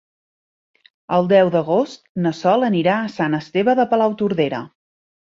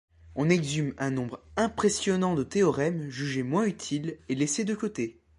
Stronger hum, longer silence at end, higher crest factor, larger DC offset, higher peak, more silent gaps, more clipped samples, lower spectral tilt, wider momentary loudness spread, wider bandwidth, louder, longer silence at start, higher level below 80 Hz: neither; first, 0.7 s vs 0.25 s; about the same, 16 dB vs 18 dB; neither; first, -4 dBFS vs -10 dBFS; first, 2.09-2.15 s vs none; neither; first, -7 dB/octave vs -5 dB/octave; about the same, 8 LU vs 8 LU; second, 7.6 kHz vs 11.5 kHz; first, -18 LUFS vs -28 LUFS; first, 1.1 s vs 0.25 s; about the same, -62 dBFS vs -58 dBFS